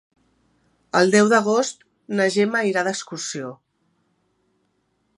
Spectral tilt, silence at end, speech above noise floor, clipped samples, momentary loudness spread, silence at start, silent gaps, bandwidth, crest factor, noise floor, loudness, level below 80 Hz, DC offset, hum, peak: -4 dB/octave; 1.65 s; 49 dB; under 0.1%; 14 LU; 0.95 s; none; 11.5 kHz; 22 dB; -69 dBFS; -20 LUFS; -72 dBFS; under 0.1%; none; -2 dBFS